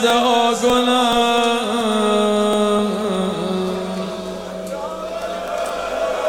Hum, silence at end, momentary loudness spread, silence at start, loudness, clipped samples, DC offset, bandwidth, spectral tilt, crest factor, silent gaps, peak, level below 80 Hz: none; 0 s; 12 LU; 0 s; -19 LUFS; under 0.1%; under 0.1%; over 20 kHz; -4 dB/octave; 14 dB; none; -4 dBFS; -50 dBFS